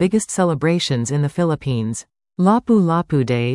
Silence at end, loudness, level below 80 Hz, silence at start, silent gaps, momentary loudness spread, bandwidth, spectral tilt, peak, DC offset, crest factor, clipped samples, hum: 0 s; -18 LUFS; -50 dBFS; 0 s; none; 7 LU; 12 kHz; -6 dB/octave; -4 dBFS; under 0.1%; 14 dB; under 0.1%; none